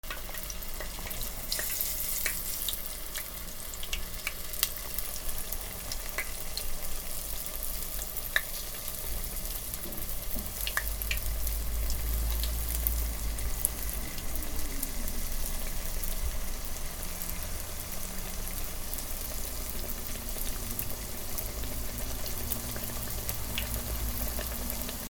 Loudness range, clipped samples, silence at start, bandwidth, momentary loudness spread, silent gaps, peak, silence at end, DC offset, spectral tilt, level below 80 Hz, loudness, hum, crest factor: 4 LU; under 0.1%; 0.05 s; over 20 kHz; 6 LU; none; -2 dBFS; 0 s; under 0.1%; -2.5 dB/octave; -36 dBFS; -34 LUFS; none; 30 dB